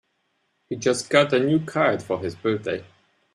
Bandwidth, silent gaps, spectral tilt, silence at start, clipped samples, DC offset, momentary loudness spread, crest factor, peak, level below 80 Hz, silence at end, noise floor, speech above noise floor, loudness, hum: 13 kHz; none; -5 dB/octave; 0.7 s; under 0.1%; under 0.1%; 11 LU; 22 dB; -2 dBFS; -64 dBFS; 0.5 s; -71 dBFS; 49 dB; -23 LUFS; none